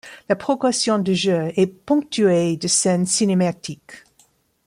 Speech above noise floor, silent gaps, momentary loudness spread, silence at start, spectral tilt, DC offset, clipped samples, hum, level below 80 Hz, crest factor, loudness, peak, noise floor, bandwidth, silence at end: 40 dB; none; 6 LU; 0.05 s; -4.5 dB/octave; under 0.1%; under 0.1%; none; -62 dBFS; 14 dB; -19 LUFS; -6 dBFS; -59 dBFS; 15.5 kHz; 0.7 s